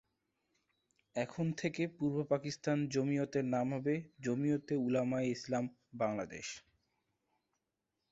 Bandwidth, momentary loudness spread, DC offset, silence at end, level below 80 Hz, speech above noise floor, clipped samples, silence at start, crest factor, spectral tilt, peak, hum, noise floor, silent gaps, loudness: 8 kHz; 7 LU; under 0.1%; 1.55 s; -74 dBFS; 51 dB; under 0.1%; 1.15 s; 18 dB; -6.5 dB/octave; -20 dBFS; none; -87 dBFS; none; -37 LUFS